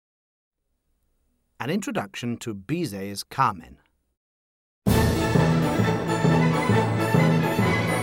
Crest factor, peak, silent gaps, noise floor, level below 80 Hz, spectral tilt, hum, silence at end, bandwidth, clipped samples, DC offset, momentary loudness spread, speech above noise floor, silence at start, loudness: 18 dB; -6 dBFS; 4.17-4.82 s; -73 dBFS; -42 dBFS; -6.5 dB/octave; none; 0 s; 17 kHz; under 0.1%; under 0.1%; 11 LU; 45 dB; 1.6 s; -23 LUFS